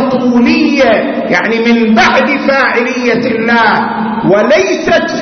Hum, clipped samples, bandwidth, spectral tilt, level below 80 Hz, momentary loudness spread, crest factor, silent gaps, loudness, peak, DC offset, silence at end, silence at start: none; under 0.1%; 6.6 kHz; -5 dB/octave; -42 dBFS; 4 LU; 10 dB; none; -9 LUFS; 0 dBFS; under 0.1%; 0 s; 0 s